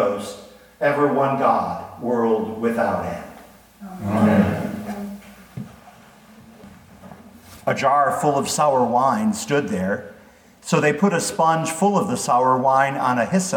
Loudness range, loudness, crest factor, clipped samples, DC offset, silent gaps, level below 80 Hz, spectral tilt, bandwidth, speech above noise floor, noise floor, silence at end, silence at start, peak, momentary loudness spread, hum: 5 LU; -20 LUFS; 18 dB; under 0.1%; under 0.1%; none; -58 dBFS; -5.5 dB/octave; 19 kHz; 29 dB; -49 dBFS; 0 s; 0 s; -2 dBFS; 17 LU; none